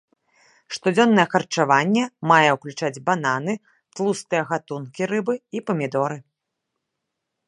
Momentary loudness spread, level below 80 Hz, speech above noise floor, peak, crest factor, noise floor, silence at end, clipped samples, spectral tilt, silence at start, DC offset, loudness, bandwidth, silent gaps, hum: 12 LU; -74 dBFS; 59 dB; 0 dBFS; 22 dB; -80 dBFS; 1.25 s; under 0.1%; -5 dB/octave; 0.7 s; under 0.1%; -21 LUFS; 11.5 kHz; none; none